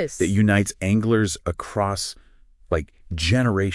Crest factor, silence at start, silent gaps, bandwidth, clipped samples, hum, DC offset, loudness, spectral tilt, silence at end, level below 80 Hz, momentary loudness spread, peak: 18 dB; 0 s; none; 12 kHz; under 0.1%; none; under 0.1%; -22 LUFS; -5.5 dB/octave; 0 s; -42 dBFS; 9 LU; -4 dBFS